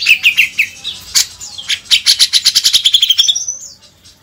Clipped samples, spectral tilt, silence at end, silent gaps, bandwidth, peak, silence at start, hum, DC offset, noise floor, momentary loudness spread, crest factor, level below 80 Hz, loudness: 0.7%; 4 dB/octave; 0.5 s; none; over 20 kHz; 0 dBFS; 0 s; none; under 0.1%; -43 dBFS; 12 LU; 14 dB; -52 dBFS; -9 LUFS